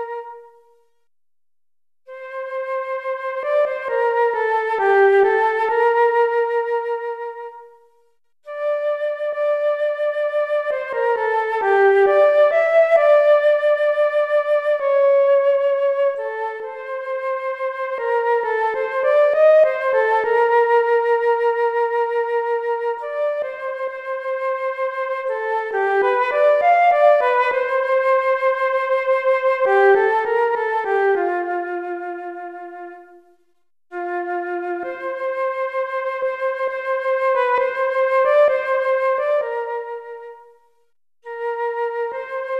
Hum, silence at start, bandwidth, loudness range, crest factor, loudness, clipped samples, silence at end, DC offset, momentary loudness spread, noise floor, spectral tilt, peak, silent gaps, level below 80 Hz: none; 0 s; 7.2 kHz; 9 LU; 14 dB; -19 LUFS; under 0.1%; 0 s; under 0.1%; 13 LU; under -90 dBFS; -4 dB/octave; -4 dBFS; none; -70 dBFS